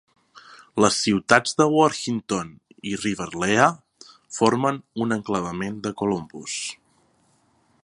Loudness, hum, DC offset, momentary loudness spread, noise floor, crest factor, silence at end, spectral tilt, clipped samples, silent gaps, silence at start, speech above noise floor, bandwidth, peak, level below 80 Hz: -23 LUFS; none; under 0.1%; 13 LU; -63 dBFS; 24 dB; 1.1 s; -4 dB/octave; under 0.1%; none; 0.35 s; 41 dB; 11.5 kHz; 0 dBFS; -58 dBFS